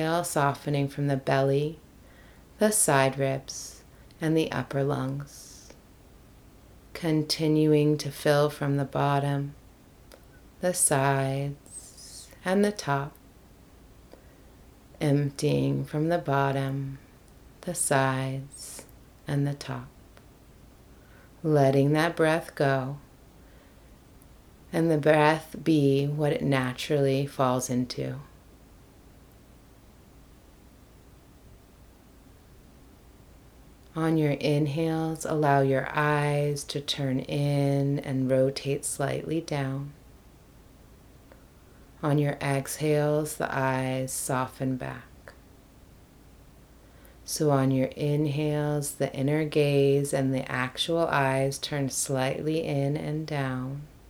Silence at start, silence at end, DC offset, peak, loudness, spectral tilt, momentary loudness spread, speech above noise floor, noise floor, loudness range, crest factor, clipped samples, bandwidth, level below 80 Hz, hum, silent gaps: 0 s; 0.2 s; under 0.1%; -6 dBFS; -27 LUFS; -5.5 dB/octave; 14 LU; 27 dB; -53 dBFS; 7 LU; 22 dB; under 0.1%; 18.5 kHz; -56 dBFS; none; none